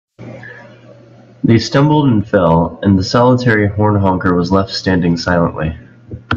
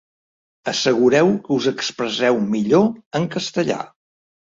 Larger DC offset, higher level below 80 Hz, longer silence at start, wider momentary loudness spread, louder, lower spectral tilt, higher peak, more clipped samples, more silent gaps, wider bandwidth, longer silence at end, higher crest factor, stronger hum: neither; first, -42 dBFS vs -60 dBFS; second, 0.2 s vs 0.65 s; first, 21 LU vs 9 LU; first, -13 LUFS vs -19 LUFS; first, -7 dB/octave vs -5 dB/octave; about the same, 0 dBFS vs -2 dBFS; neither; second, none vs 3.06-3.11 s; about the same, 7.4 kHz vs 7.8 kHz; second, 0 s vs 0.65 s; about the same, 14 dB vs 16 dB; neither